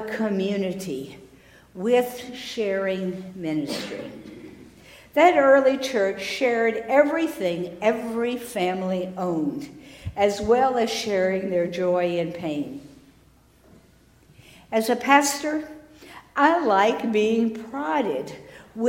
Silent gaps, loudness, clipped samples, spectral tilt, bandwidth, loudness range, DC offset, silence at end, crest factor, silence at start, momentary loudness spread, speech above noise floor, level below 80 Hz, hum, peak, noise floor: none; -23 LUFS; under 0.1%; -4.5 dB/octave; 16 kHz; 7 LU; under 0.1%; 0 s; 22 dB; 0 s; 16 LU; 33 dB; -56 dBFS; none; -2 dBFS; -56 dBFS